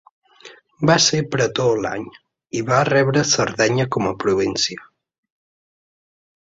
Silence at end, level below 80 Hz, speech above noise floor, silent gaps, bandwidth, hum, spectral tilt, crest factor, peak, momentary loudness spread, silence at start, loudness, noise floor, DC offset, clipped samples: 1.7 s; -54 dBFS; 27 dB; none; 8 kHz; none; -4 dB/octave; 18 dB; -2 dBFS; 12 LU; 0.45 s; -18 LUFS; -46 dBFS; under 0.1%; under 0.1%